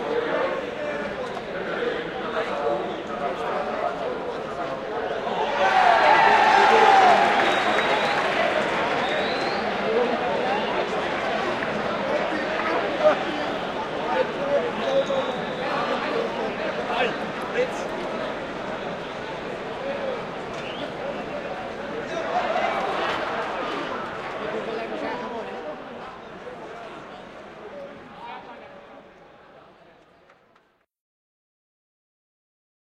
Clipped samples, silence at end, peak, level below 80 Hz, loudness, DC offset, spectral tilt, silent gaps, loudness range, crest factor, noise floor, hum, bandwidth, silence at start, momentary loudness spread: under 0.1%; 3.4 s; -6 dBFS; -56 dBFS; -24 LUFS; under 0.1%; -4 dB/octave; none; 19 LU; 20 dB; -63 dBFS; none; 13 kHz; 0 s; 19 LU